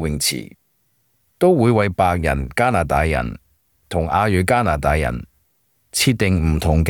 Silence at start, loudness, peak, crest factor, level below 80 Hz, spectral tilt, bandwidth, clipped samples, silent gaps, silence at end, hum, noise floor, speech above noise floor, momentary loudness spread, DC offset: 0 s; -18 LUFS; -4 dBFS; 16 dB; -32 dBFS; -5 dB/octave; 19.5 kHz; under 0.1%; none; 0 s; none; -65 dBFS; 47 dB; 9 LU; under 0.1%